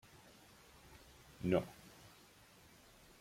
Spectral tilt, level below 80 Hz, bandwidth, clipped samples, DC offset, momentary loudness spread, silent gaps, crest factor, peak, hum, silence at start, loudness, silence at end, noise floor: -6.5 dB/octave; -66 dBFS; 16.5 kHz; under 0.1%; under 0.1%; 25 LU; none; 26 dB; -20 dBFS; none; 0.9 s; -39 LUFS; 1.5 s; -64 dBFS